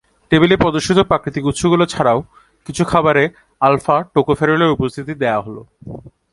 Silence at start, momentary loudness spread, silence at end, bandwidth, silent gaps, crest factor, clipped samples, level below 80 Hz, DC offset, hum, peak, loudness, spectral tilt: 0.3 s; 17 LU; 0.25 s; 11.5 kHz; none; 16 dB; under 0.1%; -42 dBFS; under 0.1%; none; 0 dBFS; -16 LUFS; -5.5 dB/octave